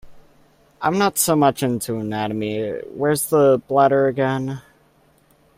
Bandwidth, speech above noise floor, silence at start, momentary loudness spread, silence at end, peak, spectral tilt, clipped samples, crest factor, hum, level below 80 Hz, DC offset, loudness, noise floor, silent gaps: 16 kHz; 38 dB; 0.05 s; 10 LU; 0.95 s; -2 dBFS; -5 dB/octave; under 0.1%; 18 dB; none; -56 dBFS; under 0.1%; -19 LUFS; -57 dBFS; none